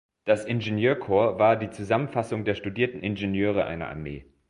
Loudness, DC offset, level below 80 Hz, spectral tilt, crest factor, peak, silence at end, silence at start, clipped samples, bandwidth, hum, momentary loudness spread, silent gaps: -26 LUFS; under 0.1%; -52 dBFS; -7 dB/octave; 18 dB; -8 dBFS; 0.3 s; 0.25 s; under 0.1%; 11 kHz; none; 8 LU; none